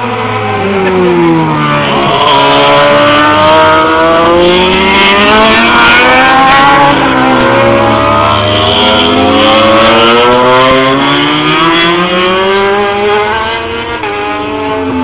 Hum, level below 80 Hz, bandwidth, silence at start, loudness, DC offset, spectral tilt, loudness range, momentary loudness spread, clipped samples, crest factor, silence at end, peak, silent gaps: none; -30 dBFS; 4 kHz; 0 s; -6 LUFS; 0.8%; -8.5 dB/octave; 4 LU; 8 LU; under 0.1%; 6 dB; 0 s; 0 dBFS; none